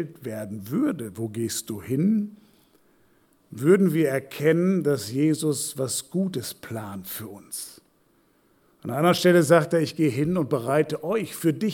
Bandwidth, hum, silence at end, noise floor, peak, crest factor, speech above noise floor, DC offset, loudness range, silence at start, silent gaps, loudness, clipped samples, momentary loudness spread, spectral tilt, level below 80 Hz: 19 kHz; none; 0 s; -63 dBFS; -6 dBFS; 20 dB; 40 dB; under 0.1%; 7 LU; 0 s; none; -24 LUFS; under 0.1%; 16 LU; -5.5 dB/octave; -66 dBFS